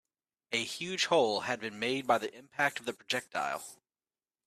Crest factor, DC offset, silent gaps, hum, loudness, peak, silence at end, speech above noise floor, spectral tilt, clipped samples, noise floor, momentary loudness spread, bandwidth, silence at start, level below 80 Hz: 20 dB; under 0.1%; none; none; -32 LUFS; -14 dBFS; 0.7 s; over 57 dB; -2.5 dB/octave; under 0.1%; under -90 dBFS; 11 LU; 14.5 kHz; 0.5 s; -78 dBFS